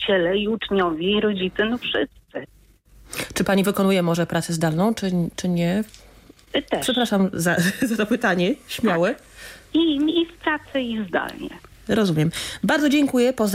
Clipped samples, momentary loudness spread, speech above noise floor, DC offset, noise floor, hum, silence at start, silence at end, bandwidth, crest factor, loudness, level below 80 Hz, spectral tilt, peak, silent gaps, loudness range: under 0.1%; 11 LU; 32 dB; under 0.1%; -53 dBFS; none; 0 s; 0 s; 16 kHz; 14 dB; -22 LUFS; -50 dBFS; -5 dB/octave; -8 dBFS; none; 2 LU